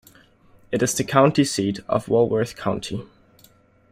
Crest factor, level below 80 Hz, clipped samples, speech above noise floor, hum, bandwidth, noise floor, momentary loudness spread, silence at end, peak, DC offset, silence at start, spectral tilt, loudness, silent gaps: 20 dB; -56 dBFS; under 0.1%; 34 dB; none; 16 kHz; -55 dBFS; 11 LU; 0.85 s; -2 dBFS; under 0.1%; 0.7 s; -5 dB/octave; -21 LUFS; none